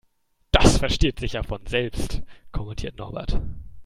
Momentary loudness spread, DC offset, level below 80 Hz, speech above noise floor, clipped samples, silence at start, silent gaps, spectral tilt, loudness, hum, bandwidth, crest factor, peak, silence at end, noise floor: 16 LU; under 0.1%; -28 dBFS; 41 dB; under 0.1%; 0.55 s; none; -4.5 dB/octave; -25 LUFS; none; 15.5 kHz; 24 dB; 0 dBFS; 0 s; -65 dBFS